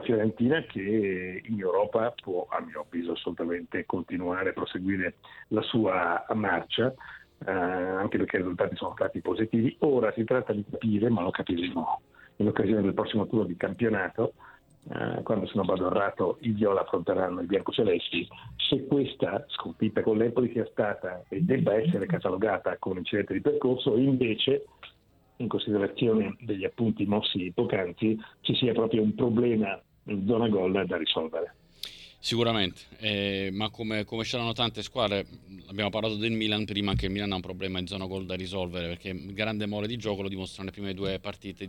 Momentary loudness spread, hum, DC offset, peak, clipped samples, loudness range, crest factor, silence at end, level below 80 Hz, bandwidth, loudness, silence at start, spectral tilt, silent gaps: 9 LU; none; under 0.1%; -10 dBFS; under 0.1%; 4 LU; 18 dB; 0 s; -56 dBFS; 12 kHz; -29 LUFS; 0 s; -6.5 dB/octave; none